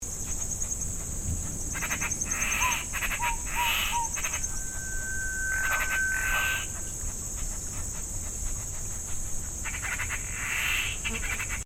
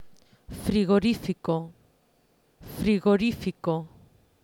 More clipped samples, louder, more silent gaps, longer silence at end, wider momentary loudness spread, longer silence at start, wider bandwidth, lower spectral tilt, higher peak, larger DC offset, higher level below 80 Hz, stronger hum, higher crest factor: neither; second, -29 LUFS vs -26 LUFS; neither; second, 0 s vs 0.55 s; second, 8 LU vs 21 LU; about the same, 0 s vs 0 s; first, over 20 kHz vs 17 kHz; second, -1 dB/octave vs -7 dB/octave; about the same, -14 dBFS vs -12 dBFS; neither; first, -38 dBFS vs -50 dBFS; neither; about the same, 16 dB vs 16 dB